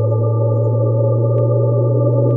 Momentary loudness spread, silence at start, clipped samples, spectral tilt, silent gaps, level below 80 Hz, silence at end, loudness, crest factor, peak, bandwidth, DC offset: 1 LU; 0 s; under 0.1%; -15.5 dB/octave; none; -62 dBFS; 0 s; -15 LUFS; 10 dB; -4 dBFS; 1.3 kHz; under 0.1%